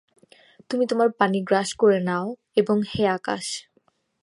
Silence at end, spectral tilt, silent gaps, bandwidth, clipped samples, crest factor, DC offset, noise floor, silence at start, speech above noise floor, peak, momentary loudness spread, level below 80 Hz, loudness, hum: 0.6 s; -5 dB/octave; none; 11.5 kHz; under 0.1%; 20 dB; under 0.1%; -66 dBFS; 0.7 s; 44 dB; -2 dBFS; 9 LU; -60 dBFS; -23 LUFS; none